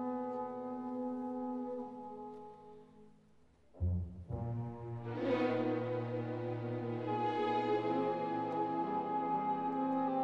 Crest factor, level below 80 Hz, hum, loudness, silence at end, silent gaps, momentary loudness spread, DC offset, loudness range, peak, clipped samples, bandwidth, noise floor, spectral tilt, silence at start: 14 dB; -60 dBFS; none; -38 LUFS; 0 s; none; 10 LU; under 0.1%; 8 LU; -24 dBFS; under 0.1%; 7.2 kHz; -65 dBFS; -9 dB/octave; 0 s